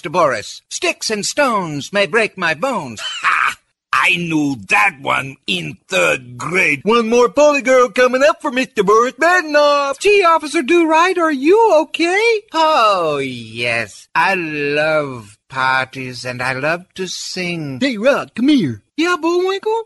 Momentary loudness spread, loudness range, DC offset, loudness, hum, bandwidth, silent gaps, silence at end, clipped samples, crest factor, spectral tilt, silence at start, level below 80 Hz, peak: 9 LU; 5 LU; under 0.1%; -15 LUFS; none; 12 kHz; none; 0 s; under 0.1%; 12 dB; -4 dB/octave; 0.05 s; -56 dBFS; -2 dBFS